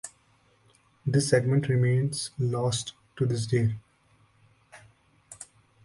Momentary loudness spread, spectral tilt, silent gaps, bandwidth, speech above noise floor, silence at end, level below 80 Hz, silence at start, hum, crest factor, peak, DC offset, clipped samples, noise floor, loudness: 21 LU; -5.5 dB/octave; none; 11.5 kHz; 39 dB; 0.4 s; -58 dBFS; 0.05 s; none; 20 dB; -10 dBFS; under 0.1%; under 0.1%; -64 dBFS; -27 LUFS